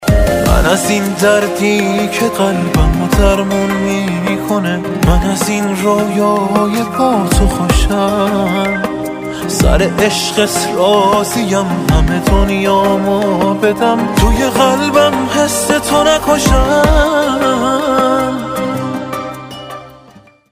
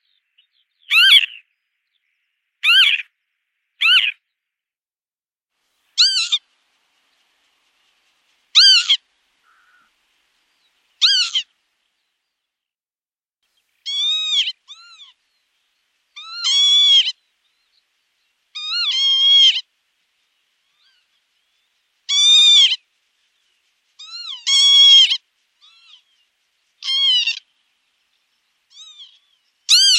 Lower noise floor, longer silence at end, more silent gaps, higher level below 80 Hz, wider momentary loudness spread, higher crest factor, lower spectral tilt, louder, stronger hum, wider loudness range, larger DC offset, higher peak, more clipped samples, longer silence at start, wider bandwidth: second, -42 dBFS vs under -90 dBFS; first, 0.6 s vs 0 s; neither; first, -20 dBFS vs under -90 dBFS; second, 7 LU vs 17 LU; second, 12 dB vs 20 dB; first, -5 dB/octave vs 10.5 dB/octave; about the same, -12 LUFS vs -12 LUFS; neither; second, 2 LU vs 8 LU; neither; about the same, 0 dBFS vs 0 dBFS; neither; second, 0 s vs 0.9 s; about the same, 16 kHz vs 15 kHz